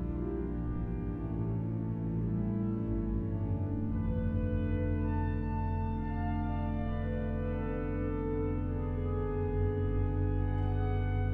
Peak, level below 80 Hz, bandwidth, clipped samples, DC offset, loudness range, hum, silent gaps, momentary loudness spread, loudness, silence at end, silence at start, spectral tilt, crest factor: -20 dBFS; -38 dBFS; 3.8 kHz; under 0.1%; under 0.1%; 1 LU; none; none; 3 LU; -34 LUFS; 0 s; 0 s; -11.5 dB/octave; 12 dB